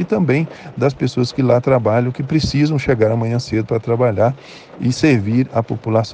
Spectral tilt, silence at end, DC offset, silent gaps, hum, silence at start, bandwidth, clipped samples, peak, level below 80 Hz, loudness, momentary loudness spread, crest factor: -7 dB/octave; 0 s; under 0.1%; none; none; 0 s; 9.2 kHz; under 0.1%; 0 dBFS; -44 dBFS; -17 LUFS; 6 LU; 16 dB